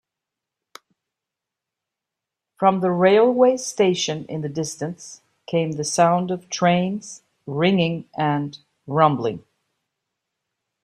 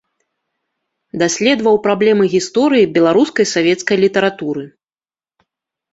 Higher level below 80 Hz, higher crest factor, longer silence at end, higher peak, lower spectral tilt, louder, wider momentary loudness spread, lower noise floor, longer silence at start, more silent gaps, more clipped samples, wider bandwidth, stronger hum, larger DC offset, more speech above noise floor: second, -66 dBFS vs -58 dBFS; first, 20 dB vs 14 dB; first, 1.45 s vs 1.25 s; about the same, -2 dBFS vs -2 dBFS; about the same, -5 dB/octave vs -4.5 dB/octave; second, -21 LUFS vs -14 LUFS; first, 15 LU vs 8 LU; second, -86 dBFS vs under -90 dBFS; first, 2.6 s vs 1.15 s; neither; neither; first, 12.5 kHz vs 8 kHz; neither; neither; second, 66 dB vs over 77 dB